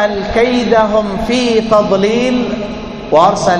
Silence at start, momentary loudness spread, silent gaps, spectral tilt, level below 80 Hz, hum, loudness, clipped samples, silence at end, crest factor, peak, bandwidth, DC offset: 0 s; 8 LU; none; -5 dB/octave; -34 dBFS; none; -12 LUFS; 0.2%; 0 s; 12 dB; 0 dBFS; 10.5 kHz; under 0.1%